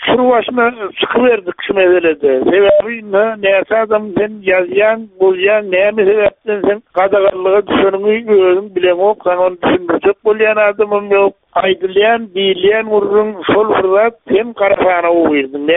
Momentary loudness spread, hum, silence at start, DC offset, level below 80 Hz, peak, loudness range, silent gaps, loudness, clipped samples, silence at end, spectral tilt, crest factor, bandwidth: 5 LU; none; 0 s; under 0.1%; -50 dBFS; 0 dBFS; 1 LU; none; -12 LUFS; under 0.1%; 0 s; -2.5 dB/octave; 12 dB; 3.9 kHz